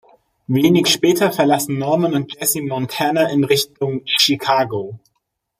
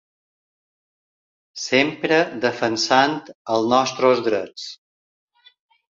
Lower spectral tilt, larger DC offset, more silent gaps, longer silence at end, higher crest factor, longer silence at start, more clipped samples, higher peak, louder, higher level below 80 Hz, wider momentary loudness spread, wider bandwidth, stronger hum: about the same, -4 dB/octave vs -3.5 dB/octave; neither; second, none vs 3.35-3.45 s; second, 0.65 s vs 1.25 s; about the same, 18 dB vs 20 dB; second, 0.5 s vs 1.55 s; neither; about the same, 0 dBFS vs -2 dBFS; about the same, -17 LUFS vs -19 LUFS; first, -60 dBFS vs -66 dBFS; second, 8 LU vs 15 LU; first, 16 kHz vs 7.8 kHz; neither